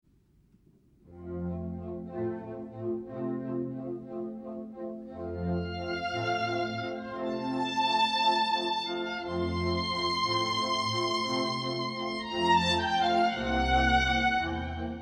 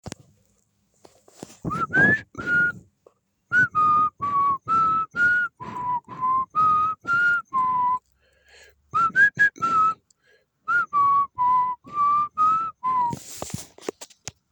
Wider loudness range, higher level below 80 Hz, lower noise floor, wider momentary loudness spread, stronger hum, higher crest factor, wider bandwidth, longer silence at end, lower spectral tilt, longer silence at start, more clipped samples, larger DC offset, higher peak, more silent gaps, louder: first, 10 LU vs 2 LU; first, -46 dBFS vs -58 dBFS; about the same, -64 dBFS vs -67 dBFS; about the same, 14 LU vs 15 LU; neither; about the same, 18 dB vs 16 dB; second, 11.5 kHz vs over 20 kHz; second, 0 s vs 0.45 s; about the same, -4.5 dB/octave vs -4 dB/octave; first, 1.05 s vs 0.05 s; neither; neither; second, -12 dBFS vs -8 dBFS; neither; second, -30 LUFS vs -21 LUFS